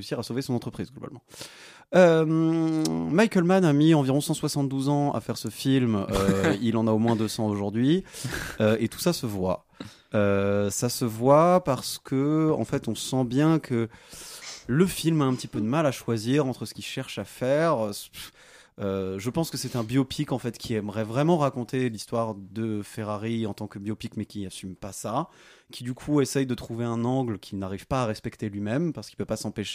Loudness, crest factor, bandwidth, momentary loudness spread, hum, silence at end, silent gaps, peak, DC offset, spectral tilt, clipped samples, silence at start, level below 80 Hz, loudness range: -26 LUFS; 20 dB; 15.5 kHz; 14 LU; none; 0 s; none; -6 dBFS; under 0.1%; -6 dB/octave; under 0.1%; 0 s; -54 dBFS; 7 LU